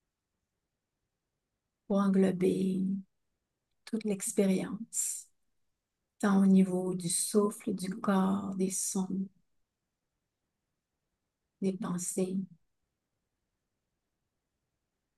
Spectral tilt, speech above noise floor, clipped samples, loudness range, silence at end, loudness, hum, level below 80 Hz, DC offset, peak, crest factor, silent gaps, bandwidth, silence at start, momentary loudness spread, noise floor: -5.5 dB/octave; 57 dB; under 0.1%; 9 LU; 2.7 s; -31 LUFS; none; -78 dBFS; under 0.1%; -14 dBFS; 18 dB; none; 12.5 kHz; 1.9 s; 10 LU; -86 dBFS